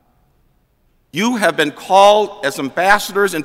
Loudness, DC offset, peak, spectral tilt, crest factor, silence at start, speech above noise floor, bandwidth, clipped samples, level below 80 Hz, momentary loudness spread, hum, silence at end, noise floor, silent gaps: -14 LUFS; under 0.1%; 0 dBFS; -3.5 dB/octave; 16 dB; 1.15 s; 45 dB; 16 kHz; under 0.1%; -52 dBFS; 10 LU; none; 0 s; -59 dBFS; none